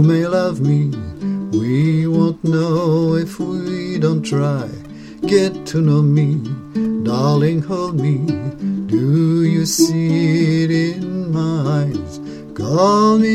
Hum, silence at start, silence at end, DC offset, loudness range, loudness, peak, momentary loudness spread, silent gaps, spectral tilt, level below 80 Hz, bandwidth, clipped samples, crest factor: none; 0 s; 0 s; under 0.1%; 2 LU; -17 LUFS; 0 dBFS; 9 LU; none; -7 dB/octave; -48 dBFS; 14 kHz; under 0.1%; 16 dB